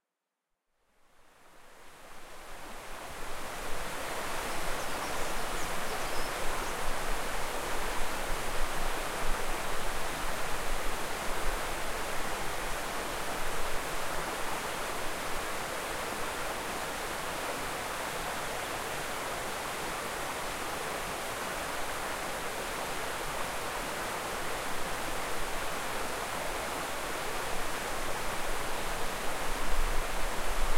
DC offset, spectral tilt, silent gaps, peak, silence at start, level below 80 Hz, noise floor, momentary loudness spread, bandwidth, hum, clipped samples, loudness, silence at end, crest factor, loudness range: under 0.1%; -2.5 dB/octave; none; -14 dBFS; 1.2 s; -40 dBFS; -87 dBFS; 1 LU; 16 kHz; none; under 0.1%; -35 LUFS; 0 s; 18 dB; 2 LU